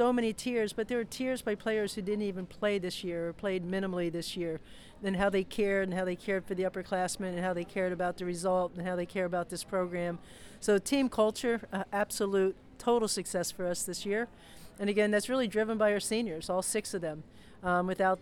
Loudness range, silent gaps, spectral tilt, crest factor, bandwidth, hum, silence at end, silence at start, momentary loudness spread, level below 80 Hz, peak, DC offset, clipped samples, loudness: 3 LU; none; -4.5 dB/octave; 16 dB; 18.5 kHz; none; 0 s; 0 s; 8 LU; -58 dBFS; -16 dBFS; under 0.1%; under 0.1%; -32 LUFS